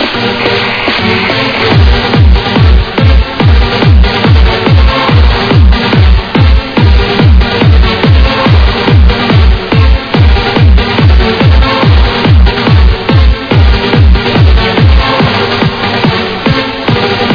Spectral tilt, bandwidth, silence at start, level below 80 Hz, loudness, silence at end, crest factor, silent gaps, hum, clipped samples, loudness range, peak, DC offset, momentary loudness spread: -7.5 dB/octave; 5.4 kHz; 0 s; -10 dBFS; -7 LUFS; 0 s; 6 dB; none; none; 6%; 1 LU; 0 dBFS; under 0.1%; 3 LU